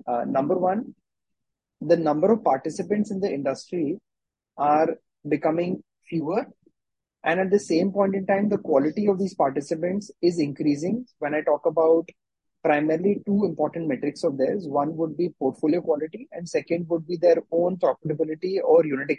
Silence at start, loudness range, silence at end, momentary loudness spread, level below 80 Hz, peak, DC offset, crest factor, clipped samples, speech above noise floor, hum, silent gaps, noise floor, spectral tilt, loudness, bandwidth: 0.05 s; 3 LU; 0 s; 8 LU; -70 dBFS; -6 dBFS; under 0.1%; 18 dB; under 0.1%; 62 dB; none; none; -85 dBFS; -7 dB/octave; -24 LUFS; 9.8 kHz